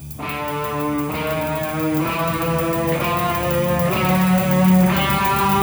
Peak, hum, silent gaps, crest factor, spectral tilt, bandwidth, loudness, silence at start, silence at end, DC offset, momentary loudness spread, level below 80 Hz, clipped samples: -4 dBFS; none; none; 14 dB; -6 dB/octave; over 20 kHz; -19 LUFS; 0 s; 0 s; under 0.1%; 8 LU; -38 dBFS; under 0.1%